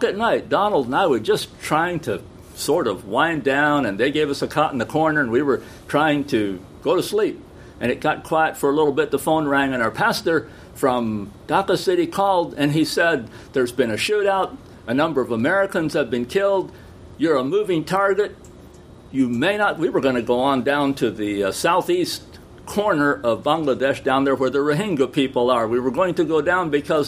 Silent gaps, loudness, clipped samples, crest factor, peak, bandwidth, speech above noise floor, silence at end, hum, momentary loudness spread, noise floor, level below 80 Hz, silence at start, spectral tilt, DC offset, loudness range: none; -20 LUFS; under 0.1%; 18 dB; -2 dBFS; 15.5 kHz; 23 dB; 0 s; none; 6 LU; -43 dBFS; -52 dBFS; 0 s; -5 dB/octave; under 0.1%; 2 LU